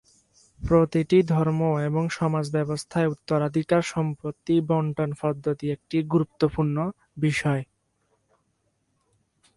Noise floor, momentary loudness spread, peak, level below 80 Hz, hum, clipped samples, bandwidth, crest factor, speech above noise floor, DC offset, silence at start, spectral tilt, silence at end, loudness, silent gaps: -72 dBFS; 8 LU; -8 dBFS; -50 dBFS; none; under 0.1%; 11.5 kHz; 18 dB; 48 dB; under 0.1%; 0.6 s; -7.5 dB/octave; 1.95 s; -25 LUFS; none